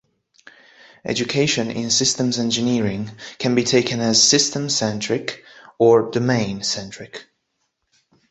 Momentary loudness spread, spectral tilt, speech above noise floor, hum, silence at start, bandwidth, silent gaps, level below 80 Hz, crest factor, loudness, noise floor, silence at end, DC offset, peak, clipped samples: 18 LU; -3.5 dB/octave; 53 dB; none; 1.05 s; 8.4 kHz; none; -56 dBFS; 18 dB; -19 LUFS; -73 dBFS; 1.1 s; under 0.1%; -2 dBFS; under 0.1%